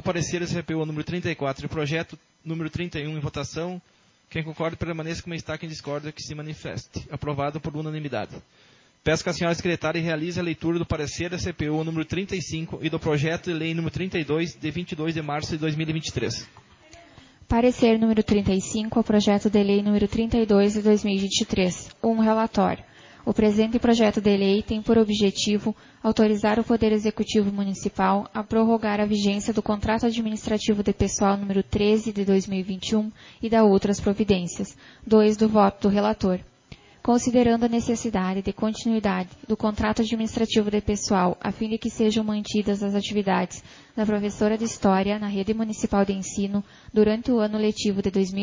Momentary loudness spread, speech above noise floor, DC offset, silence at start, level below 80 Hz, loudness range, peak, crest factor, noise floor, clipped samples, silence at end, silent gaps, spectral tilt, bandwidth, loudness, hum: 11 LU; 27 dB; under 0.1%; 0.05 s; -46 dBFS; 9 LU; -6 dBFS; 18 dB; -50 dBFS; under 0.1%; 0 s; none; -5.5 dB/octave; 7.6 kHz; -24 LUFS; none